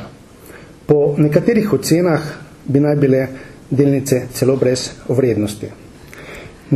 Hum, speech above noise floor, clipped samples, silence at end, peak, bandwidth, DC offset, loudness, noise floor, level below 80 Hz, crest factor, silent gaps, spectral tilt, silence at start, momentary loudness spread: none; 24 dB; under 0.1%; 0 s; 0 dBFS; 13.5 kHz; under 0.1%; -16 LUFS; -39 dBFS; -46 dBFS; 16 dB; none; -6.5 dB/octave; 0 s; 20 LU